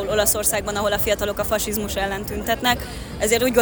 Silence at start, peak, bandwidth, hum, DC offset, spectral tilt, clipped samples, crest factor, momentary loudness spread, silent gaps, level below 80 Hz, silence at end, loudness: 0 s; -4 dBFS; over 20 kHz; none; under 0.1%; -3 dB/octave; under 0.1%; 18 dB; 7 LU; none; -36 dBFS; 0 s; -21 LUFS